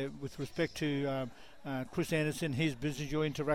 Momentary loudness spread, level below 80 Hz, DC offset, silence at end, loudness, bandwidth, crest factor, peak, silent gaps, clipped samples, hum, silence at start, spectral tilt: 8 LU; -56 dBFS; 0.2%; 0 s; -36 LUFS; 16.5 kHz; 16 dB; -20 dBFS; none; under 0.1%; none; 0 s; -6 dB/octave